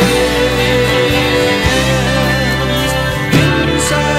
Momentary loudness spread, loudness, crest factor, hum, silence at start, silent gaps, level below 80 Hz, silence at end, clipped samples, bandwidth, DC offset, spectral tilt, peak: 2 LU; -12 LUFS; 12 dB; none; 0 s; none; -26 dBFS; 0 s; under 0.1%; 16.5 kHz; under 0.1%; -4.5 dB/octave; 0 dBFS